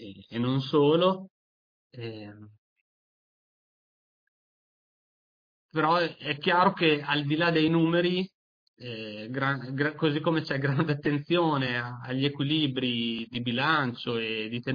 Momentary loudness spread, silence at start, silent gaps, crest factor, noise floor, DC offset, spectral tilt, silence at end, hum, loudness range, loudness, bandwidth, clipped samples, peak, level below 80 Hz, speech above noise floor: 14 LU; 0 s; 1.30-1.90 s, 2.58-5.69 s, 8.34-8.74 s; 18 dB; under -90 dBFS; under 0.1%; -8 dB/octave; 0 s; none; 12 LU; -27 LUFS; 5.2 kHz; under 0.1%; -10 dBFS; -70 dBFS; over 63 dB